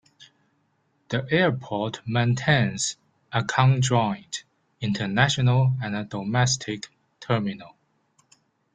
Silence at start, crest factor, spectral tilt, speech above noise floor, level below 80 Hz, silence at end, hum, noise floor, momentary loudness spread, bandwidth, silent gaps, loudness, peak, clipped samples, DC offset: 0.2 s; 22 dB; -5 dB/octave; 46 dB; -58 dBFS; 1.05 s; none; -69 dBFS; 14 LU; 9.4 kHz; none; -24 LUFS; -4 dBFS; under 0.1%; under 0.1%